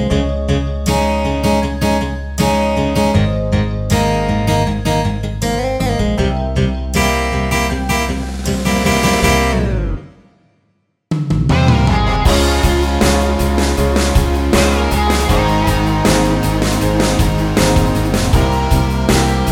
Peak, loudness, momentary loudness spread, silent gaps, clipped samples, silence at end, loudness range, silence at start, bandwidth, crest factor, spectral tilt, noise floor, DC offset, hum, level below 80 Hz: 0 dBFS; -15 LUFS; 5 LU; none; under 0.1%; 0 s; 3 LU; 0 s; 16.5 kHz; 14 dB; -5.5 dB/octave; -62 dBFS; under 0.1%; none; -20 dBFS